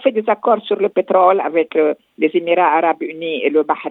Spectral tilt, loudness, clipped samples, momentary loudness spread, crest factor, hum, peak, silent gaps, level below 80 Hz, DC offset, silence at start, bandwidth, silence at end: -8 dB/octave; -16 LUFS; under 0.1%; 6 LU; 16 dB; none; 0 dBFS; none; -80 dBFS; under 0.1%; 0 s; 4.1 kHz; 0 s